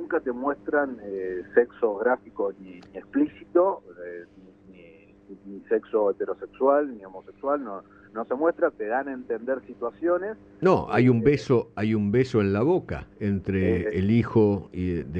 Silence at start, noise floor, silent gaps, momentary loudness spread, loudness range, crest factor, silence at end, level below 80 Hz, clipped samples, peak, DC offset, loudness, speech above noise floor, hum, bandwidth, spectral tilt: 0 s; -51 dBFS; none; 15 LU; 6 LU; 20 dB; 0 s; -54 dBFS; under 0.1%; -6 dBFS; under 0.1%; -25 LUFS; 26 dB; none; 8.2 kHz; -9 dB/octave